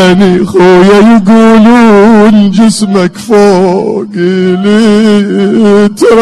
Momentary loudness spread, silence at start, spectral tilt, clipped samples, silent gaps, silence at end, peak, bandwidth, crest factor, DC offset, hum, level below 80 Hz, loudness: 6 LU; 0 s; -6.5 dB/octave; 10%; none; 0 s; 0 dBFS; 12 kHz; 4 dB; under 0.1%; none; -36 dBFS; -5 LUFS